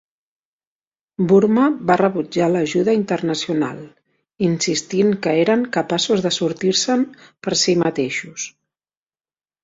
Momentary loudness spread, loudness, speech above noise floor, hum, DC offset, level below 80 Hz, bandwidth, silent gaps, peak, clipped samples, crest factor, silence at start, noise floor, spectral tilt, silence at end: 10 LU; -18 LUFS; over 72 dB; none; under 0.1%; -60 dBFS; 7.8 kHz; none; -2 dBFS; under 0.1%; 16 dB; 1.2 s; under -90 dBFS; -4.5 dB/octave; 1.15 s